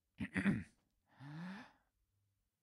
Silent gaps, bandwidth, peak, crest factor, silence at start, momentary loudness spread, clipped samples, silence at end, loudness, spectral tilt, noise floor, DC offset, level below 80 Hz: none; 11 kHz; -22 dBFS; 22 dB; 0.2 s; 21 LU; under 0.1%; 0.95 s; -42 LUFS; -7 dB/octave; -84 dBFS; under 0.1%; -68 dBFS